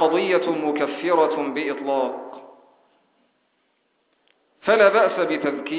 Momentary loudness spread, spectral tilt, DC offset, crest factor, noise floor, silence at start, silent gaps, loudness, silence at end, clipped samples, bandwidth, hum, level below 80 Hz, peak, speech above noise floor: 11 LU; -8.5 dB/octave; under 0.1%; 20 dB; -69 dBFS; 0 s; none; -21 LUFS; 0 s; under 0.1%; 4 kHz; none; -72 dBFS; -2 dBFS; 48 dB